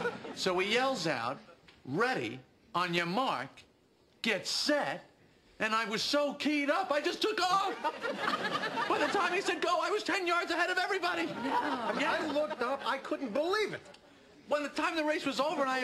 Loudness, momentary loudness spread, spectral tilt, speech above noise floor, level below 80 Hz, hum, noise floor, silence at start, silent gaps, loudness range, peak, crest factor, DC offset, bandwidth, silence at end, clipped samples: -32 LUFS; 7 LU; -3.5 dB/octave; 34 dB; -74 dBFS; none; -66 dBFS; 0 s; none; 3 LU; -16 dBFS; 18 dB; under 0.1%; 13.5 kHz; 0 s; under 0.1%